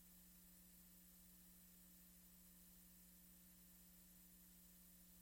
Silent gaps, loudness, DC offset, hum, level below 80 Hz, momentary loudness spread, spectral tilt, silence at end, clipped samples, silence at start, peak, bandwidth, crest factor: none; -65 LUFS; under 0.1%; 60 Hz at -75 dBFS; -78 dBFS; 0 LU; -3 dB/octave; 0 s; under 0.1%; 0 s; -54 dBFS; 16.5 kHz; 14 dB